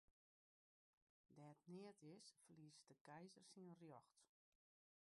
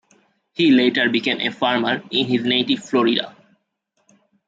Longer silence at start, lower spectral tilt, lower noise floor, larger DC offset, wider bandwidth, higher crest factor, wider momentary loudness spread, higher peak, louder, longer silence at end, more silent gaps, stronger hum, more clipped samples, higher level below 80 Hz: second, 0.1 s vs 0.6 s; about the same, -5 dB/octave vs -5 dB/octave; first, under -90 dBFS vs -70 dBFS; neither; first, 11.5 kHz vs 7.8 kHz; about the same, 18 dB vs 16 dB; about the same, 7 LU vs 6 LU; second, -50 dBFS vs -4 dBFS; second, -65 LUFS vs -18 LUFS; second, 0.75 s vs 1.15 s; first, 0.11-1.24 s, 3.01-3.05 s vs none; neither; neither; second, under -90 dBFS vs -66 dBFS